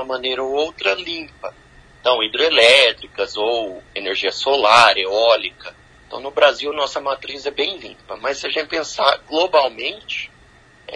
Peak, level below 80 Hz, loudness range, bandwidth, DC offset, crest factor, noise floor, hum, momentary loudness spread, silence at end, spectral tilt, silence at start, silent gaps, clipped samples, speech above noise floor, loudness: 0 dBFS; -54 dBFS; 6 LU; 10.5 kHz; under 0.1%; 18 dB; -49 dBFS; none; 17 LU; 0 s; -1.5 dB/octave; 0 s; none; under 0.1%; 31 dB; -17 LUFS